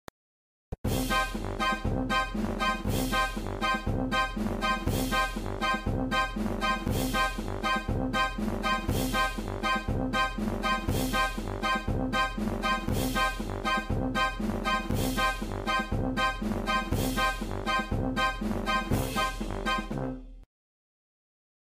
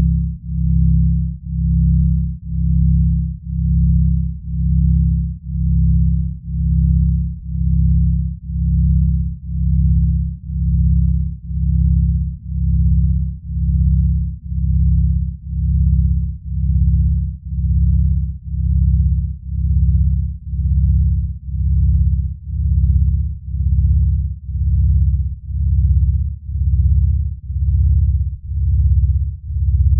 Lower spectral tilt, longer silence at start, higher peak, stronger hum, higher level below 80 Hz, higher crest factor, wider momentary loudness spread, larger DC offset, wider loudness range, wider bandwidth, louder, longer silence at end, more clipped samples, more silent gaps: second, -4.5 dB/octave vs -18 dB/octave; first, 0.7 s vs 0 s; second, -14 dBFS vs -4 dBFS; neither; second, -38 dBFS vs -18 dBFS; about the same, 16 dB vs 12 dB; second, 4 LU vs 8 LU; neither; about the same, 1 LU vs 1 LU; first, 16 kHz vs 0.3 kHz; second, -29 LUFS vs -18 LUFS; first, 1.2 s vs 0 s; neither; first, 0.78-0.84 s vs none